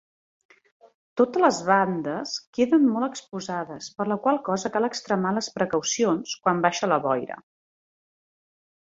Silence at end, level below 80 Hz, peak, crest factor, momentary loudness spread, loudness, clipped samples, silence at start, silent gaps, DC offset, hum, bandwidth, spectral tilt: 1.5 s; -68 dBFS; -4 dBFS; 20 dB; 11 LU; -24 LUFS; under 0.1%; 1.15 s; 2.47-2.53 s; under 0.1%; none; 8 kHz; -4.5 dB/octave